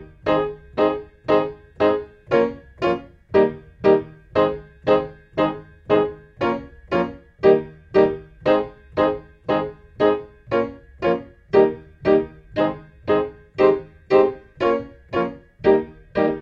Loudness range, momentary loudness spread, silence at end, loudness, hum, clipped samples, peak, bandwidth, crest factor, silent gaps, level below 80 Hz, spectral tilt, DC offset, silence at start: 2 LU; 10 LU; 0 s; -22 LUFS; none; under 0.1%; -2 dBFS; 6.2 kHz; 18 dB; none; -48 dBFS; -8 dB/octave; under 0.1%; 0 s